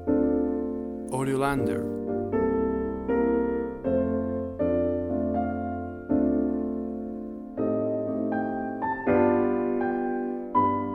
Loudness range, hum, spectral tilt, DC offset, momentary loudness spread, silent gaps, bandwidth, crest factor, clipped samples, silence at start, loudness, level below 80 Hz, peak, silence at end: 2 LU; none; -8 dB/octave; under 0.1%; 8 LU; none; 12.5 kHz; 16 dB; under 0.1%; 0 s; -27 LUFS; -48 dBFS; -10 dBFS; 0 s